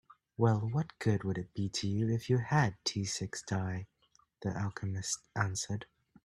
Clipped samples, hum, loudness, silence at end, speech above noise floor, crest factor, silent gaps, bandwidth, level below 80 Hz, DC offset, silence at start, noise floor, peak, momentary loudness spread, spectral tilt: under 0.1%; none; -34 LUFS; 0.4 s; 37 dB; 22 dB; none; 12.5 kHz; -64 dBFS; under 0.1%; 0.4 s; -71 dBFS; -12 dBFS; 9 LU; -5 dB/octave